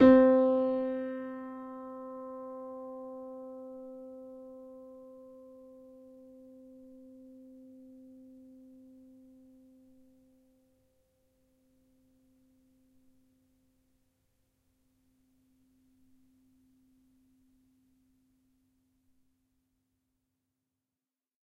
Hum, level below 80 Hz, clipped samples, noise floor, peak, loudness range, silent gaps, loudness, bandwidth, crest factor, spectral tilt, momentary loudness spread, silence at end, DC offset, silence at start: none; -68 dBFS; under 0.1%; under -90 dBFS; -10 dBFS; 23 LU; none; -31 LUFS; 4.5 kHz; 26 dB; -8 dB/octave; 26 LU; 16.4 s; under 0.1%; 0 s